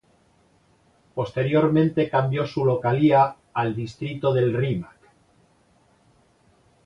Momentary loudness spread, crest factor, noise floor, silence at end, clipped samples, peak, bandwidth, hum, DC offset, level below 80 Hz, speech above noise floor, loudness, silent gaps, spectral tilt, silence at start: 12 LU; 18 dB; -61 dBFS; 2 s; under 0.1%; -6 dBFS; 7.6 kHz; none; under 0.1%; -58 dBFS; 39 dB; -22 LUFS; none; -8.5 dB/octave; 1.15 s